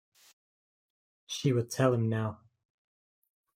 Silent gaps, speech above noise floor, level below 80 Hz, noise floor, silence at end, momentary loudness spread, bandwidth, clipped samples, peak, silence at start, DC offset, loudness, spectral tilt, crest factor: none; over 61 dB; -72 dBFS; under -90 dBFS; 1.2 s; 10 LU; 16 kHz; under 0.1%; -12 dBFS; 1.3 s; under 0.1%; -30 LUFS; -6 dB/octave; 22 dB